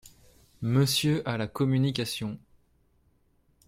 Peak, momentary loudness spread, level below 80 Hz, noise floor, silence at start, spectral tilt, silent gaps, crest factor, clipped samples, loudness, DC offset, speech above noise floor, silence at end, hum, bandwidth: -12 dBFS; 12 LU; -60 dBFS; -67 dBFS; 0.05 s; -5.5 dB/octave; none; 18 dB; under 0.1%; -27 LUFS; under 0.1%; 40 dB; 1.3 s; none; 16 kHz